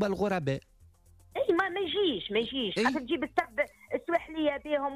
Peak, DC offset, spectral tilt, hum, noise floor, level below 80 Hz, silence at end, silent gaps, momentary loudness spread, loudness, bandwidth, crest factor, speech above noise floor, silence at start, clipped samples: -16 dBFS; under 0.1%; -5.5 dB/octave; none; -59 dBFS; -60 dBFS; 0 s; none; 5 LU; -30 LUFS; 14.5 kHz; 16 dB; 29 dB; 0 s; under 0.1%